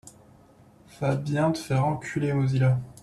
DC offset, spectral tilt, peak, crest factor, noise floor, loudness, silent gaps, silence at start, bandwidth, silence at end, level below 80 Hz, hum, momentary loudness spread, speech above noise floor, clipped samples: under 0.1%; -7.5 dB/octave; -12 dBFS; 14 dB; -55 dBFS; -26 LUFS; none; 0.05 s; 12 kHz; 0.1 s; -56 dBFS; none; 5 LU; 30 dB; under 0.1%